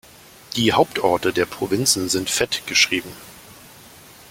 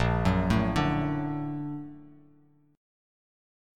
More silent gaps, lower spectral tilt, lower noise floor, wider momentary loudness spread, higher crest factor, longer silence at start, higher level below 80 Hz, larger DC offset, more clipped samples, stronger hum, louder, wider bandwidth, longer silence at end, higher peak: neither; second, -2.5 dB/octave vs -7.5 dB/octave; second, -45 dBFS vs -61 dBFS; about the same, 12 LU vs 13 LU; about the same, 20 dB vs 20 dB; first, 0.5 s vs 0 s; second, -54 dBFS vs -40 dBFS; neither; neither; neither; first, -19 LUFS vs -28 LUFS; first, 17 kHz vs 13 kHz; second, 0.65 s vs 1.65 s; first, -2 dBFS vs -10 dBFS